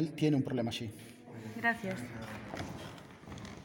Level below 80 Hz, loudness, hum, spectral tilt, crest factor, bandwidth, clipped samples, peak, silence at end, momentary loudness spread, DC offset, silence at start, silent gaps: -64 dBFS; -36 LUFS; none; -6 dB/octave; 18 dB; 17 kHz; under 0.1%; -18 dBFS; 0 s; 18 LU; under 0.1%; 0 s; none